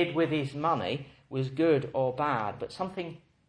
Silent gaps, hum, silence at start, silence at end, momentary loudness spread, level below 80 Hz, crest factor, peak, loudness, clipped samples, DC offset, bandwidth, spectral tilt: none; none; 0 s; 0.3 s; 12 LU; -64 dBFS; 16 dB; -14 dBFS; -30 LUFS; under 0.1%; under 0.1%; 10 kHz; -7.5 dB/octave